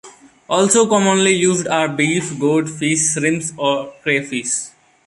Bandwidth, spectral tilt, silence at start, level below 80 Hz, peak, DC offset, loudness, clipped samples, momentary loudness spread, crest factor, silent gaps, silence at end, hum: 11.5 kHz; -3.5 dB/octave; 0.05 s; -60 dBFS; -2 dBFS; under 0.1%; -16 LUFS; under 0.1%; 7 LU; 16 dB; none; 0.4 s; none